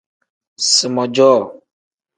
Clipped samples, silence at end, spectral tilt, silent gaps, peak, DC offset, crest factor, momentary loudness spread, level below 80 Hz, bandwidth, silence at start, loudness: under 0.1%; 0.65 s; -2.5 dB/octave; none; 0 dBFS; under 0.1%; 16 dB; 7 LU; -68 dBFS; 10 kHz; 0.6 s; -14 LUFS